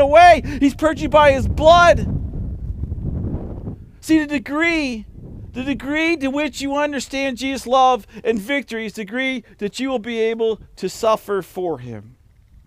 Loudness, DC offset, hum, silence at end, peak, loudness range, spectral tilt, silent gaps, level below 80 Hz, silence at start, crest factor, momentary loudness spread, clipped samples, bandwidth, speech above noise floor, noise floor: -18 LUFS; under 0.1%; none; 0.6 s; 0 dBFS; 6 LU; -5.5 dB/octave; none; -34 dBFS; 0 s; 18 dB; 17 LU; under 0.1%; 16 kHz; 32 dB; -49 dBFS